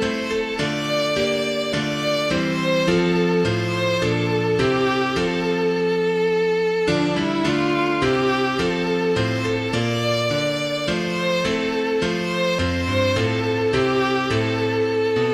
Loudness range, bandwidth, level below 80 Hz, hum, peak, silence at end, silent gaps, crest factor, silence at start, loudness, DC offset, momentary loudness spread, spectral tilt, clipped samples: 1 LU; 15 kHz; -46 dBFS; none; -8 dBFS; 0 s; none; 14 dB; 0 s; -21 LUFS; under 0.1%; 3 LU; -5.5 dB/octave; under 0.1%